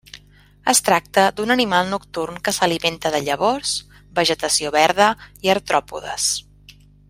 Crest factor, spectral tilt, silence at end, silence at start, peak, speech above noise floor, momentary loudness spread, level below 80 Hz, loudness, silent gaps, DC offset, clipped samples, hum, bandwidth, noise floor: 18 dB; -2 dB/octave; 0.7 s; 0.15 s; -2 dBFS; 31 dB; 10 LU; -52 dBFS; -19 LUFS; none; under 0.1%; under 0.1%; 50 Hz at -45 dBFS; 16 kHz; -50 dBFS